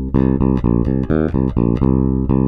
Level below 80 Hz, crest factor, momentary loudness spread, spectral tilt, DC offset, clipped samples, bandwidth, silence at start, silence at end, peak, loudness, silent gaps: -24 dBFS; 12 dB; 2 LU; -12 dB/octave; under 0.1%; under 0.1%; 4.8 kHz; 0 s; 0 s; -2 dBFS; -16 LUFS; none